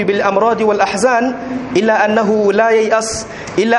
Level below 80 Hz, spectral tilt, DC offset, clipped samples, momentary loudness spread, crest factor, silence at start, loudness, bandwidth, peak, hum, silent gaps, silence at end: -48 dBFS; -4.5 dB/octave; under 0.1%; under 0.1%; 8 LU; 14 dB; 0 s; -14 LUFS; 11.5 kHz; 0 dBFS; none; none; 0 s